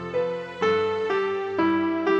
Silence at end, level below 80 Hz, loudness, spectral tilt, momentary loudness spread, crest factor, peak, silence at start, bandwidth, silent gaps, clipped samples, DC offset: 0 s; -66 dBFS; -25 LUFS; -6.5 dB/octave; 5 LU; 12 dB; -12 dBFS; 0 s; 7.4 kHz; none; under 0.1%; under 0.1%